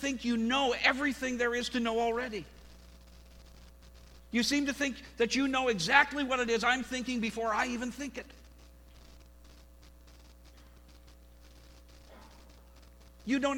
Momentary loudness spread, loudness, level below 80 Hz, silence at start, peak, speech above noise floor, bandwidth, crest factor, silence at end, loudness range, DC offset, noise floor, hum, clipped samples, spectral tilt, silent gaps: 13 LU; -30 LUFS; -56 dBFS; 0 s; -8 dBFS; 24 dB; 18.5 kHz; 26 dB; 0 s; 11 LU; under 0.1%; -55 dBFS; 60 Hz at -55 dBFS; under 0.1%; -3 dB/octave; none